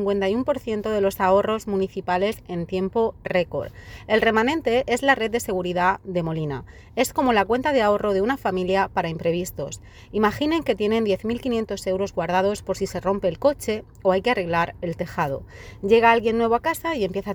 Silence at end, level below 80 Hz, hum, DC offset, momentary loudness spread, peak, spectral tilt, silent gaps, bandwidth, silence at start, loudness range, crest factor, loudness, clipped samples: 0 s; -46 dBFS; none; under 0.1%; 9 LU; -2 dBFS; -5.5 dB/octave; none; over 20 kHz; 0 s; 2 LU; 20 dB; -23 LUFS; under 0.1%